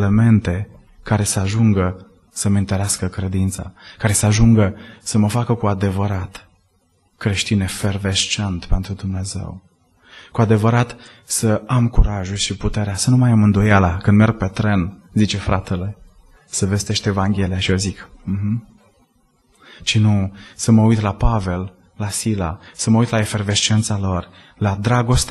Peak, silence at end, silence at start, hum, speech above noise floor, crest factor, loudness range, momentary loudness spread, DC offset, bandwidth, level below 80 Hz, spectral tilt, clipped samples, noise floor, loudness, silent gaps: 0 dBFS; 0 s; 0 s; none; 44 dB; 18 dB; 5 LU; 12 LU; under 0.1%; 12.5 kHz; -30 dBFS; -5 dB/octave; under 0.1%; -61 dBFS; -18 LUFS; none